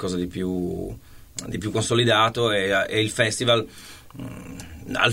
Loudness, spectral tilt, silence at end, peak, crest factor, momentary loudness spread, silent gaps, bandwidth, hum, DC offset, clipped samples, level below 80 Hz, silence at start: -22 LUFS; -4 dB/octave; 0 s; -2 dBFS; 22 dB; 20 LU; none; 16 kHz; none; 0.2%; under 0.1%; -48 dBFS; 0 s